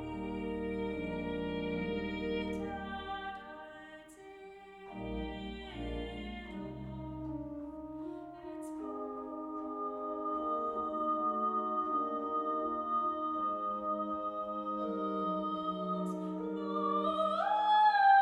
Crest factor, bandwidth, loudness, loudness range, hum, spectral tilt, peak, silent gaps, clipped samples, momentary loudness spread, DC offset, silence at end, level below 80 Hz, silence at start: 20 dB; 11.5 kHz; -36 LUFS; 9 LU; none; -7 dB/octave; -16 dBFS; none; under 0.1%; 13 LU; under 0.1%; 0 s; -56 dBFS; 0 s